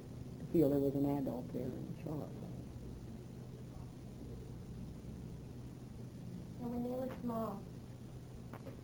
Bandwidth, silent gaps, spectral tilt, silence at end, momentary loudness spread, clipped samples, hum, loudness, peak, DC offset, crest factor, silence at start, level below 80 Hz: over 20 kHz; none; -8.5 dB/octave; 0 s; 16 LU; under 0.1%; none; -42 LUFS; -20 dBFS; under 0.1%; 22 dB; 0 s; -58 dBFS